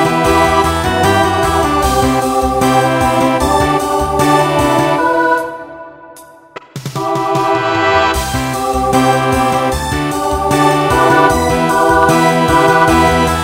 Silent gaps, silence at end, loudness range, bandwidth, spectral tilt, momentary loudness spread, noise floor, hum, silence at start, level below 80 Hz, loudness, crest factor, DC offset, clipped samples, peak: none; 0 s; 5 LU; 16.5 kHz; -5 dB/octave; 7 LU; -37 dBFS; none; 0 s; -28 dBFS; -12 LUFS; 12 dB; under 0.1%; under 0.1%; 0 dBFS